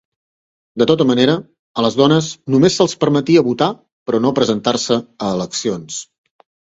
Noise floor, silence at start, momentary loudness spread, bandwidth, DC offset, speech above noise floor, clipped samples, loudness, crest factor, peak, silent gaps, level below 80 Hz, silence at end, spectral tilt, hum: under -90 dBFS; 0.75 s; 11 LU; 8 kHz; under 0.1%; over 75 dB; under 0.1%; -16 LUFS; 16 dB; 0 dBFS; 1.59-1.75 s, 3.92-4.06 s; -54 dBFS; 0.6 s; -5 dB/octave; none